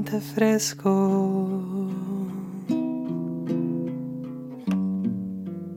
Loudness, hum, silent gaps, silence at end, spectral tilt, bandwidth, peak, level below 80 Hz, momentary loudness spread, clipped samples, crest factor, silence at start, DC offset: -27 LUFS; none; none; 0 s; -6 dB/octave; 17 kHz; -8 dBFS; -68 dBFS; 11 LU; under 0.1%; 18 dB; 0 s; under 0.1%